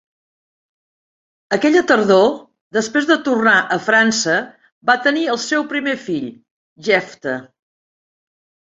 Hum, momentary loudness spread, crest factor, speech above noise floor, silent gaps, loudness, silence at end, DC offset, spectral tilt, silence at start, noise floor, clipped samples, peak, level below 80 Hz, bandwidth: none; 12 LU; 18 dB; over 74 dB; 2.61-2.71 s, 4.72-4.81 s, 6.51-6.76 s; -16 LUFS; 1.3 s; under 0.1%; -3.5 dB/octave; 1.5 s; under -90 dBFS; under 0.1%; 0 dBFS; -64 dBFS; 8 kHz